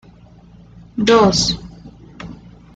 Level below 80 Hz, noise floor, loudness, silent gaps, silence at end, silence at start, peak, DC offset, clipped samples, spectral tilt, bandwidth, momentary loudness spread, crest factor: -42 dBFS; -44 dBFS; -15 LUFS; none; 0.4 s; 0.95 s; -2 dBFS; under 0.1%; under 0.1%; -4 dB/octave; 9.2 kHz; 24 LU; 18 dB